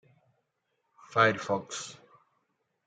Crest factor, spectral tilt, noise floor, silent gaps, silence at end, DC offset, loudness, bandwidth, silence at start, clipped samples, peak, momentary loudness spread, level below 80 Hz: 26 dB; -4 dB/octave; -79 dBFS; none; 0.9 s; under 0.1%; -29 LUFS; 9.6 kHz; 1.1 s; under 0.1%; -8 dBFS; 14 LU; -80 dBFS